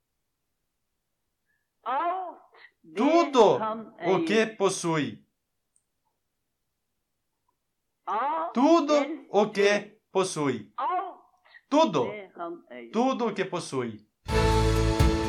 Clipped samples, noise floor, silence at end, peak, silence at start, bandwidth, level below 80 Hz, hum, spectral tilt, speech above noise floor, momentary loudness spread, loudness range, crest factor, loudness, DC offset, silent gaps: under 0.1%; -81 dBFS; 0 s; -8 dBFS; 1.85 s; 15.5 kHz; -40 dBFS; none; -5.5 dB/octave; 56 dB; 16 LU; 8 LU; 18 dB; -26 LUFS; under 0.1%; none